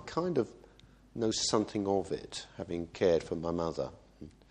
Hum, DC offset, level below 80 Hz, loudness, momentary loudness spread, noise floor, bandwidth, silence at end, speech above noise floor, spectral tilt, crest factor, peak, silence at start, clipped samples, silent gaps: none; under 0.1%; -58 dBFS; -33 LUFS; 15 LU; -59 dBFS; 10.5 kHz; 0.2 s; 26 dB; -4.5 dB/octave; 22 dB; -12 dBFS; 0 s; under 0.1%; none